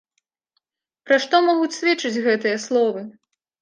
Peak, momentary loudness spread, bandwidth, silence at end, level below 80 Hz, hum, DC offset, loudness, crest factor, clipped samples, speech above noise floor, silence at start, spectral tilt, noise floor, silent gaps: -2 dBFS; 6 LU; 9.8 kHz; 0.5 s; -78 dBFS; none; under 0.1%; -20 LUFS; 20 dB; under 0.1%; 56 dB; 1.05 s; -3.5 dB/octave; -75 dBFS; none